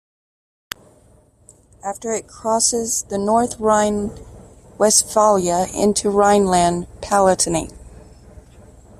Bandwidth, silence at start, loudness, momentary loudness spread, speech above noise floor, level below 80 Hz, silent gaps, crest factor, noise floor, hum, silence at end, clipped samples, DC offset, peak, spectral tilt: 15.5 kHz; 1.85 s; -17 LUFS; 16 LU; 35 dB; -44 dBFS; none; 18 dB; -52 dBFS; none; 1.1 s; under 0.1%; under 0.1%; 0 dBFS; -3.5 dB/octave